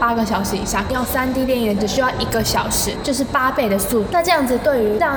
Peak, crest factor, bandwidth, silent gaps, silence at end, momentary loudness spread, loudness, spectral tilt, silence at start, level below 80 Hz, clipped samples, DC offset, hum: -4 dBFS; 14 dB; over 20 kHz; none; 0 s; 4 LU; -18 LUFS; -4 dB/octave; 0 s; -36 dBFS; under 0.1%; under 0.1%; none